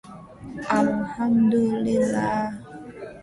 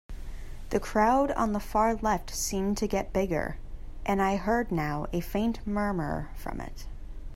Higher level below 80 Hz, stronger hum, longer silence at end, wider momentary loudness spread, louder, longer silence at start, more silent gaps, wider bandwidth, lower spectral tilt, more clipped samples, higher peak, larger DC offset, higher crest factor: second, -54 dBFS vs -40 dBFS; neither; about the same, 0 s vs 0 s; about the same, 20 LU vs 19 LU; first, -23 LUFS vs -29 LUFS; about the same, 0.05 s vs 0.1 s; neither; second, 11.5 kHz vs 16 kHz; first, -7 dB/octave vs -5.5 dB/octave; neither; first, -6 dBFS vs -12 dBFS; neither; about the same, 16 dB vs 18 dB